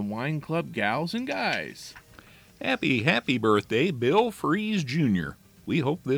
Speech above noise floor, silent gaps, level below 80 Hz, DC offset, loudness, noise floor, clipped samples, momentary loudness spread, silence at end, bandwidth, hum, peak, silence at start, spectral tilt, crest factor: 26 dB; none; -60 dBFS; under 0.1%; -26 LUFS; -52 dBFS; under 0.1%; 9 LU; 0 s; over 20 kHz; none; -8 dBFS; 0 s; -6 dB/octave; 20 dB